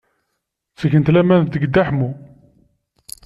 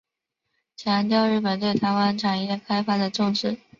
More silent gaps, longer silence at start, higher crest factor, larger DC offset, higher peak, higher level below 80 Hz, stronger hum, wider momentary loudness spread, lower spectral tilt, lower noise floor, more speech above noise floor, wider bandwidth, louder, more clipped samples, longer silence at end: neither; about the same, 0.8 s vs 0.8 s; about the same, 16 dB vs 16 dB; neither; first, -2 dBFS vs -8 dBFS; first, -48 dBFS vs -64 dBFS; neither; first, 15 LU vs 5 LU; first, -8 dB/octave vs -6 dB/octave; second, -75 dBFS vs -81 dBFS; about the same, 60 dB vs 58 dB; first, 13 kHz vs 7.4 kHz; first, -16 LUFS vs -23 LUFS; neither; first, 1.05 s vs 0.25 s